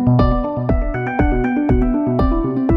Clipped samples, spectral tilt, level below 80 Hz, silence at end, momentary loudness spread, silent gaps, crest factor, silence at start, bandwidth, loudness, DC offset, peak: under 0.1%; -10.5 dB/octave; -22 dBFS; 0 s; 4 LU; none; 14 dB; 0 s; 5.6 kHz; -18 LUFS; under 0.1%; -2 dBFS